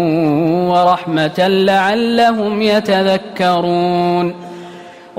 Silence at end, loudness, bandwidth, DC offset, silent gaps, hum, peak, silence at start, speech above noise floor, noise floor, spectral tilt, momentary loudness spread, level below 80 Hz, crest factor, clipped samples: 0 s; -14 LUFS; 16 kHz; under 0.1%; none; none; -2 dBFS; 0 s; 21 dB; -35 dBFS; -6.5 dB/octave; 7 LU; -54 dBFS; 12 dB; under 0.1%